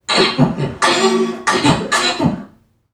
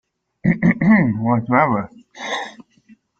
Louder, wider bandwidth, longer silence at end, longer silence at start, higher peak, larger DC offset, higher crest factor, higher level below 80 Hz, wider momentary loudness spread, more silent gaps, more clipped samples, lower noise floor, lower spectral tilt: first, -15 LUFS vs -18 LUFS; first, 14.5 kHz vs 7.8 kHz; second, 0.45 s vs 0.7 s; second, 0.1 s vs 0.45 s; about the same, 0 dBFS vs -2 dBFS; neither; about the same, 16 dB vs 18 dB; first, -44 dBFS vs -52 dBFS; second, 5 LU vs 16 LU; neither; neither; second, -45 dBFS vs -52 dBFS; second, -4 dB/octave vs -7.5 dB/octave